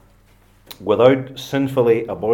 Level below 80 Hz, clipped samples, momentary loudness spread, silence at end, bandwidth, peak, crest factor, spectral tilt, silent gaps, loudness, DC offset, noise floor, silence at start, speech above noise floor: -56 dBFS; under 0.1%; 10 LU; 0 s; 17 kHz; 0 dBFS; 18 dB; -7 dB/octave; none; -17 LUFS; under 0.1%; -52 dBFS; 0.7 s; 35 dB